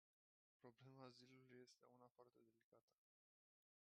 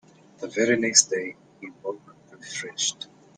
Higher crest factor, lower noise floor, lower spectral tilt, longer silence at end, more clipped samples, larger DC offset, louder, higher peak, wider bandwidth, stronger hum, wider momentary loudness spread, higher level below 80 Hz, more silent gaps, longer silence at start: about the same, 22 dB vs 26 dB; first, under -90 dBFS vs -48 dBFS; first, -5 dB/octave vs -1 dB/octave; first, 1.1 s vs 0.35 s; neither; neither; second, -67 LUFS vs -22 LUFS; second, -48 dBFS vs -2 dBFS; second, 8.4 kHz vs 10.5 kHz; neither; second, 4 LU vs 23 LU; second, under -90 dBFS vs -72 dBFS; first, 2.11-2.15 s, 2.64-2.72 s, 2.81-2.88 s vs none; first, 0.6 s vs 0.4 s